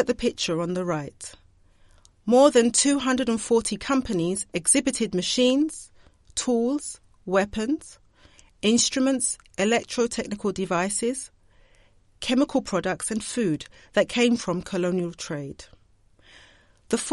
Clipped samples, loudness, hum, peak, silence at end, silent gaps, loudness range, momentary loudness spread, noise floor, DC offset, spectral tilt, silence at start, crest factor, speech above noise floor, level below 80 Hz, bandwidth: under 0.1%; -24 LUFS; none; -4 dBFS; 0 s; none; 5 LU; 12 LU; -58 dBFS; under 0.1%; -3.5 dB/octave; 0 s; 20 dB; 35 dB; -54 dBFS; 11.5 kHz